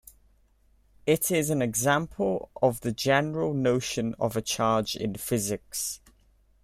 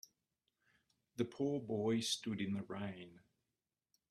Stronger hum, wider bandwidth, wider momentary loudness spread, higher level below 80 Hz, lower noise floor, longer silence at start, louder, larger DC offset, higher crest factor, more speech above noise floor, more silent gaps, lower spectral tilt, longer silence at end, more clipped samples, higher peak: neither; first, 16 kHz vs 14 kHz; second, 7 LU vs 16 LU; first, -56 dBFS vs -78 dBFS; second, -63 dBFS vs under -90 dBFS; about the same, 1.05 s vs 1.15 s; first, -27 LUFS vs -40 LUFS; neither; about the same, 20 dB vs 20 dB; second, 36 dB vs over 50 dB; neither; about the same, -4.5 dB/octave vs -4.5 dB/octave; second, 0.65 s vs 0.95 s; neither; first, -8 dBFS vs -24 dBFS